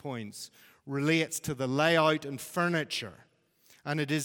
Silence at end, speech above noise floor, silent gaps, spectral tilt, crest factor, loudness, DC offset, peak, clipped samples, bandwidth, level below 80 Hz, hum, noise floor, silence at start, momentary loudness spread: 0 s; 34 dB; none; -4.5 dB/octave; 20 dB; -30 LUFS; under 0.1%; -10 dBFS; under 0.1%; 17.5 kHz; -70 dBFS; none; -64 dBFS; 0.05 s; 18 LU